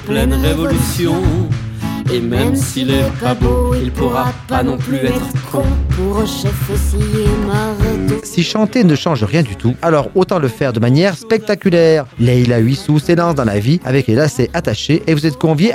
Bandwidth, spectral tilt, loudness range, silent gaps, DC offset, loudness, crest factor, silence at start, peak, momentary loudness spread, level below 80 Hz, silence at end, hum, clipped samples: 17 kHz; -6.5 dB/octave; 3 LU; none; under 0.1%; -15 LUFS; 12 dB; 0 s; -2 dBFS; 5 LU; -24 dBFS; 0 s; none; under 0.1%